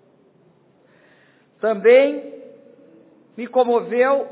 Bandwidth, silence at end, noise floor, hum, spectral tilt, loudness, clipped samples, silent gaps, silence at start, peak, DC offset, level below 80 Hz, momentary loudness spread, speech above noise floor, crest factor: 4 kHz; 0 s; -56 dBFS; none; -8.5 dB/octave; -17 LUFS; under 0.1%; none; 1.65 s; -2 dBFS; under 0.1%; -82 dBFS; 18 LU; 39 dB; 18 dB